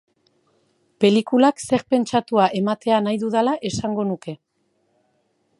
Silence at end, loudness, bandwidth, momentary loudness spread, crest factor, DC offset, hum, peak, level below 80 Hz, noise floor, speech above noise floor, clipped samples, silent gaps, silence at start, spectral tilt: 1.25 s; -20 LUFS; 11.5 kHz; 8 LU; 20 dB; under 0.1%; none; -2 dBFS; -58 dBFS; -68 dBFS; 48 dB; under 0.1%; none; 1 s; -5.5 dB/octave